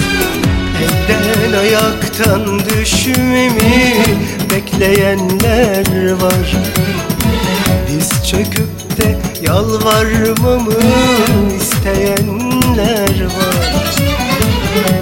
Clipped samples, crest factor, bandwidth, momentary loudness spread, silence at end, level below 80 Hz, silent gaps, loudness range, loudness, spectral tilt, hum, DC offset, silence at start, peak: under 0.1%; 12 dB; 17 kHz; 4 LU; 0 s; -26 dBFS; none; 2 LU; -12 LUFS; -4.5 dB/octave; none; under 0.1%; 0 s; 0 dBFS